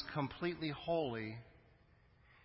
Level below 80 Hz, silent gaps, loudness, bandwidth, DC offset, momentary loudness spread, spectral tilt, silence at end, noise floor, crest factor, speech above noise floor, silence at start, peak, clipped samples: -66 dBFS; none; -41 LUFS; 5.6 kHz; under 0.1%; 9 LU; -5 dB/octave; 0.1 s; -68 dBFS; 18 dB; 28 dB; 0 s; -24 dBFS; under 0.1%